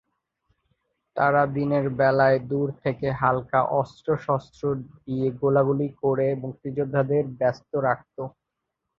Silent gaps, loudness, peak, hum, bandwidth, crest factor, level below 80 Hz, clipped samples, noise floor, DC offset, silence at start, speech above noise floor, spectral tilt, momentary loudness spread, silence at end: none; -24 LUFS; -6 dBFS; none; 7 kHz; 18 dB; -58 dBFS; under 0.1%; -82 dBFS; under 0.1%; 1.15 s; 58 dB; -9 dB/octave; 10 LU; 0.7 s